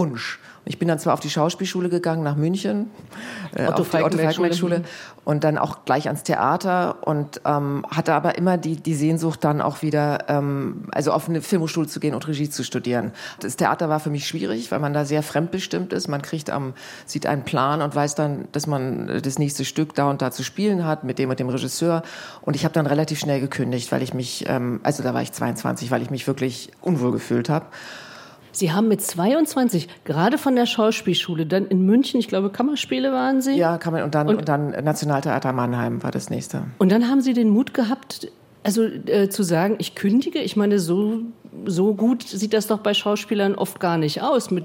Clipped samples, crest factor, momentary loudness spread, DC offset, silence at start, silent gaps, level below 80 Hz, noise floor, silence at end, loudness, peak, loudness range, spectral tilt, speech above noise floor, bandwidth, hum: under 0.1%; 18 dB; 8 LU; under 0.1%; 0 s; none; -66 dBFS; -43 dBFS; 0 s; -22 LUFS; -2 dBFS; 4 LU; -5.5 dB/octave; 21 dB; 16.5 kHz; none